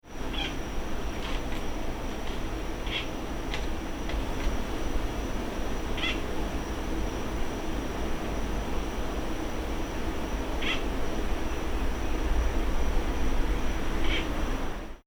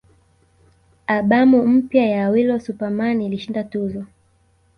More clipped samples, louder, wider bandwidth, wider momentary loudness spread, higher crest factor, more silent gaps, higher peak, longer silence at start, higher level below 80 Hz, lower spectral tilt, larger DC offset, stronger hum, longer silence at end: neither; second, -33 LUFS vs -18 LUFS; first, over 20 kHz vs 6.2 kHz; second, 5 LU vs 13 LU; about the same, 14 dB vs 16 dB; neither; second, -14 dBFS vs -4 dBFS; second, 0.05 s vs 1.1 s; first, -32 dBFS vs -56 dBFS; second, -5 dB/octave vs -8.5 dB/octave; neither; neither; second, 0.05 s vs 0.7 s